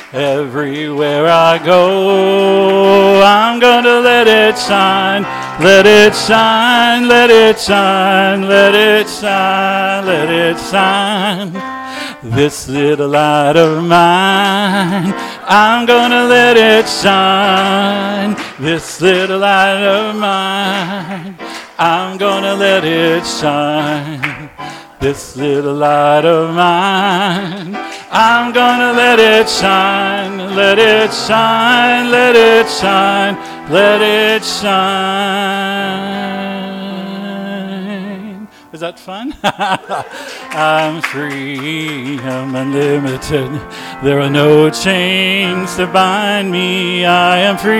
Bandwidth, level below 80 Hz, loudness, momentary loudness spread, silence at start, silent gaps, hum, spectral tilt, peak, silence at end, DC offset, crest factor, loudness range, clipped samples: 18 kHz; -46 dBFS; -10 LUFS; 15 LU; 0 s; none; none; -4.5 dB/octave; 0 dBFS; 0 s; under 0.1%; 12 dB; 9 LU; 0.4%